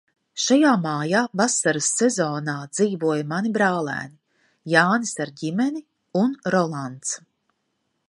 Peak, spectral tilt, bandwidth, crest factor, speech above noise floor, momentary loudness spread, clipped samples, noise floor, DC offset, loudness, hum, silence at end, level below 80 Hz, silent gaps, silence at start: -2 dBFS; -4 dB/octave; 11.5 kHz; 22 dB; 52 dB; 11 LU; under 0.1%; -74 dBFS; under 0.1%; -22 LUFS; none; 0.95 s; -72 dBFS; none; 0.35 s